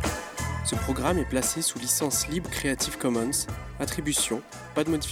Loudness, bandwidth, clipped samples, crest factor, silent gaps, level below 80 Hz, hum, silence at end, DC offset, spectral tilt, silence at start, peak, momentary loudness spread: -27 LUFS; 19.5 kHz; under 0.1%; 18 dB; none; -42 dBFS; none; 0 s; under 0.1%; -3.5 dB/octave; 0 s; -10 dBFS; 8 LU